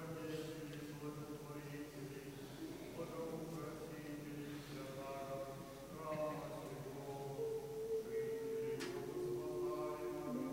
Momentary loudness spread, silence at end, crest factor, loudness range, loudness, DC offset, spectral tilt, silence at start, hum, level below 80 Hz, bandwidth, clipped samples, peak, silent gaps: 7 LU; 0 s; 14 dB; 5 LU; -47 LUFS; under 0.1%; -6 dB/octave; 0 s; none; -70 dBFS; 16 kHz; under 0.1%; -32 dBFS; none